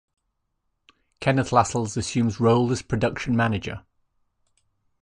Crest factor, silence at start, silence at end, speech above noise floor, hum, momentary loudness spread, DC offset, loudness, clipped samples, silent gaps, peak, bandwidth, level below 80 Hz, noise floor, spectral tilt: 22 dB; 1.2 s; 1.25 s; 53 dB; none; 8 LU; under 0.1%; -23 LUFS; under 0.1%; none; -4 dBFS; 10.5 kHz; -48 dBFS; -76 dBFS; -6 dB/octave